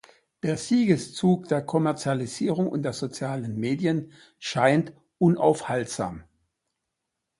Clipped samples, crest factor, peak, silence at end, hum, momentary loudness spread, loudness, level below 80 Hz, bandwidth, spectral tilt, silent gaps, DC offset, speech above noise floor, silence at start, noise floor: under 0.1%; 20 dB; -6 dBFS; 1.2 s; none; 10 LU; -25 LUFS; -62 dBFS; 11.5 kHz; -6 dB/octave; none; under 0.1%; 58 dB; 0.45 s; -82 dBFS